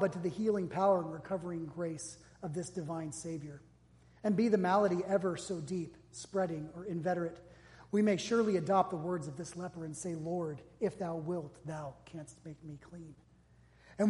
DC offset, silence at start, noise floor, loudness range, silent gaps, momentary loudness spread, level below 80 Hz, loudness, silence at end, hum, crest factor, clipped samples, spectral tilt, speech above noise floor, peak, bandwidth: under 0.1%; 0 s; -64 dBFS; 7 LU; none; 19 LU; -68 dBFS; -35 LUFS; 0 s; none; 20 dB; under 0.1%; -6 dB/octave; 29 dB; -16 dBFS; 11.5 kHz